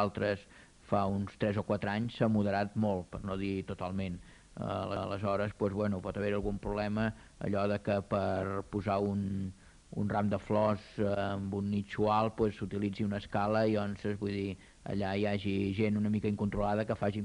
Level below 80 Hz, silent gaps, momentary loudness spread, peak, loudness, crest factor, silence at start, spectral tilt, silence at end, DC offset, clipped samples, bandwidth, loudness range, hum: -54 dBFS; none; 7 LU; -16 dBFS; -34 LUFS; 18 dB; 0 s; -8 dB/octave; 0 s; under 0.1%; under 0.1%; 10.5 kHz; 3 LU; none